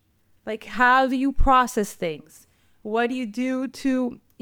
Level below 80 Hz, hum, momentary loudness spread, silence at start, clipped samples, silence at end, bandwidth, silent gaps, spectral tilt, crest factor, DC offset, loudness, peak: -32 dBFS; none; 16 LU; 0.45 s; under 0.1%; 0.25 s; 18.5 kHz; none; -4.5 dB/octave; 16 dB; under 0.1%; -23 LUFS; -6 dBFS